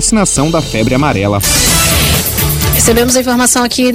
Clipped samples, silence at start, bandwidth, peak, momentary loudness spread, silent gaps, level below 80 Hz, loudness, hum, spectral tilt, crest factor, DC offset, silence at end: under 0.1%; 0 s; 17 kHz; 0 dBFS; 4 LU; none; -22 dBFS; -9 LUFS; none; -3.5 dB/octave; 10 dB; under 0.1%; 0 s